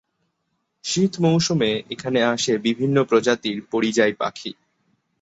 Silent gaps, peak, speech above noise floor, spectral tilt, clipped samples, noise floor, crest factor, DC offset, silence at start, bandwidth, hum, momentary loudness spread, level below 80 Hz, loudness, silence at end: none; -4 dBFS; 53 dB; -4.5 dB/octave; under 0.1%; -74 dBFS; 18 dB; under 0.1%; 0.85 s; 8.2 kHz; none; 9 LU; -60 dBFS; -21 LUFS; 0.7 s